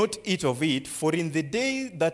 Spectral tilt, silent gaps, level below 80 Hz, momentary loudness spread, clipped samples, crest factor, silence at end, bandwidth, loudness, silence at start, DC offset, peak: -4.5 dB/octave; none; -62 dBFS; 2 LU; under 0.1%; 16 dB; 0 s; 12 kHz; -27 LUFS; 0 s; under 0.1%; -10 dBFS